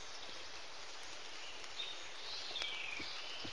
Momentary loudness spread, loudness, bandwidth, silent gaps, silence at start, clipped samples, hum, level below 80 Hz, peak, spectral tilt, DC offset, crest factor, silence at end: 8 LU; -45 LUFS; 11.5 kHz; none; 0 s; under 0.1%; none; -74 dBFS; -22 dBFS; -0.5 dB/octave; 0.4%; 26 dB; 0 s